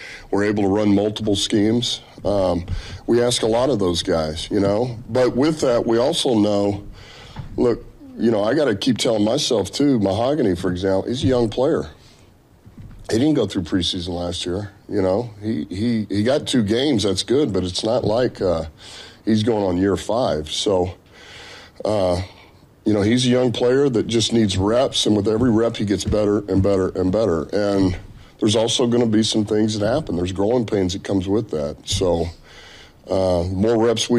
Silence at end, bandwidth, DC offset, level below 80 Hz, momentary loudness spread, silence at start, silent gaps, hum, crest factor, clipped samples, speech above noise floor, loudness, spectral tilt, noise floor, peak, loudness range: 0 s; 13 kHz; under 0.1%; -42 dBFS; 8 LU; 0 s; none; none; 10 dB; under 0.1%; 31 dB; -20 LUFS; -5.5 dB/octave; -50 dBFS; -8 dBFS; 4 LU